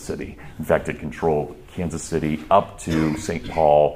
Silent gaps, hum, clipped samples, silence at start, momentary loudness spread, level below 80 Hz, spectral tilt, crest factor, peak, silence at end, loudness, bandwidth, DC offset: none; none; under 0.1%; 0 s; 13 LU; -42 dBFS; -6 dB/octave; 20 dB; -2 dBFS; 0 s; -22 LUFS; 15.5 kHz; under 0.1%